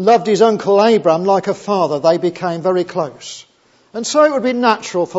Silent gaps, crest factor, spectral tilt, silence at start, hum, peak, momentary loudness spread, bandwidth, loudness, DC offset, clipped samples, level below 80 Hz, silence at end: none; 14 dB; -5 dB/octave; 0 s; none; 0 dBFS; 13 LU; 8 kHz; -15 LUFS; under 0.1%; under 0.1%; -66 dBFS; 0 s